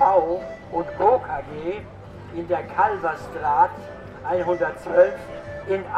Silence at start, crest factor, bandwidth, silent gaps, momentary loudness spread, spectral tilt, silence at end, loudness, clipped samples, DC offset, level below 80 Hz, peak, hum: 0 s; 18 dB; 9 kHz; none; 16 LU; -7 dB/octave; 0 s; -23 LUFS; under 0.1%; under 0.1%; -50 dBFS; -4 dBFS; none